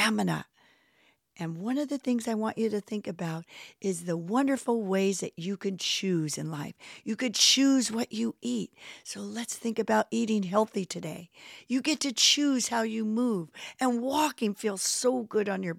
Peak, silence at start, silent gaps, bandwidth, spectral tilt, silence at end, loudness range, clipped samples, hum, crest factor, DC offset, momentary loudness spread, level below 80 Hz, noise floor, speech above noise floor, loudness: -8 dBFS; 0 s; none; 16 kHz; -3.5 dB/octave; 0 s; 5 LU; under 0.1%; none; 22 dB; under 0.1%; 16 LU; -76 dBFS; -67 dBFS; 38 dB; -28 LUFS